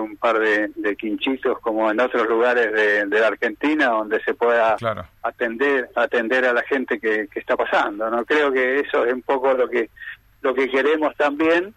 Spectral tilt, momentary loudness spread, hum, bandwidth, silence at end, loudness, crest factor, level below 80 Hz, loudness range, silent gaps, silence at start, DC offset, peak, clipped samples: -5 dB/octave; 7 LU; none; 13 kHz; 0.05 s; -20 LUFS; 14 dB; -58 dBFS; 2 LU; none; 0 s; under 0.1%; -6 dBFS; under 0.1%